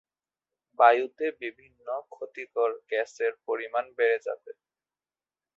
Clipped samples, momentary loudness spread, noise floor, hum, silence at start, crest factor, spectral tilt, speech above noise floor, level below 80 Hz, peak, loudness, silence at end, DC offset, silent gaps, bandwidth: under 0.1%; 18 LU; under -90 dBFS; none; 0.8 s; 24 dB; -3 dB/octave; over 62 dB; -82 dBFS; -6 dBFS; -27 LUFS; 1.05 s; under 0.1%; none; 7.6 kHz